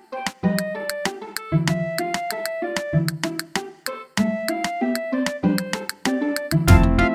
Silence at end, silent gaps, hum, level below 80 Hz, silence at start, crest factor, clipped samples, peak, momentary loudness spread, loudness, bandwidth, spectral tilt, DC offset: 0 s; none; none; -32 dBFS; 0.1 s; 22 dB; under 0.1%; 0 dBFS; 10 LU; -23 LUFS; over 20 kHz; -5.5 dB/octave; under 0.1%